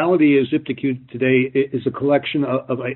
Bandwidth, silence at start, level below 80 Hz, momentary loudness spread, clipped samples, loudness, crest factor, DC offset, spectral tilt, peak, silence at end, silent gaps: 4.2 kHz; 0 s; -62 dBFS; 8 LU; under 0.1%; -19 LUFS; 14 dB; under 0.1%; -5.5 dB/octave; -4 dBFS; 0 s; none